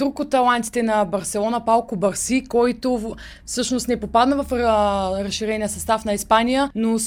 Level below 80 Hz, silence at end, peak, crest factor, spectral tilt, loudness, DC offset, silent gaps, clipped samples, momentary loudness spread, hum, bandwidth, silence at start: -42 dBFS; 0 s; -2 dBFS; 18 dB; -4 dB/octave; -20 LUFS; under 0.1%; none; under 0.1%; 6 LU; none; 20 kHz; 0 s